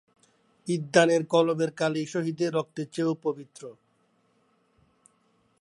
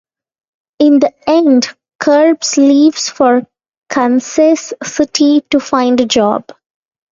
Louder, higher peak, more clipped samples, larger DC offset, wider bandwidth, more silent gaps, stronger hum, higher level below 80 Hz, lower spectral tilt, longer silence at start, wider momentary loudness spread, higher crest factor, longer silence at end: second, -26 LUFS vs -11 LUFS; second, -4 dBFS vs 0 dBFS; neither; neither; first, 11.5 kHz vs 7.6 kHz; second, none vs 1.95-1.99 s, 3.77-3.82 s; neither; second, -78 dBFS vs -54 dBFS; first, -5.5 dB/octave vs -3.5 dB/octave; second, 0.65 s vs 0.8 s; first, 19 LU vs 7 LU; first, 24 dB vs 12 dB; first, 1.9 s vs 0.7 s